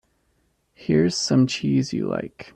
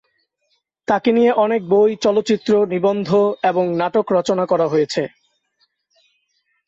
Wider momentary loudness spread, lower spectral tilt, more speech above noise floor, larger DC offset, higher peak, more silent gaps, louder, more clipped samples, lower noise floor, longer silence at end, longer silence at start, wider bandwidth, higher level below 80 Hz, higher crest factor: first, 9 LU vs 5 LU; about the same, -5.5 dB/octave vs -6 dB/octave; second, 46 dB vs 52 dB; neither; second, -8 dBFS vs -4 dBFS; neither; second, -22 LUFS vs -17 LUFS; neither; about the same, -68 dBFS vs -68 dBFS; second, 0.15 s vs 1.6 s; about the same, 0.8 s vs 0.9 s; first, 10 kHz vs 8 kHz; first, -56 dBFS vs -62 dBFS; about the same, 16 dB vs 14 dB